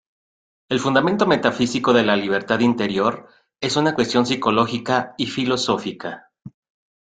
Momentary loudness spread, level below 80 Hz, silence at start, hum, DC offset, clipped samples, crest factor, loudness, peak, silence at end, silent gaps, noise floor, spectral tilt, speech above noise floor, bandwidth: 9 LU; -58 dBFS; 0.7 s; none; under 0.1%; under 0.1%; 20 dB; -20 LUFS; -2 dBFS; 0.65 s; none; under -90 dBFS; -5 dB/octave; over 70 dB; 9.4 kHz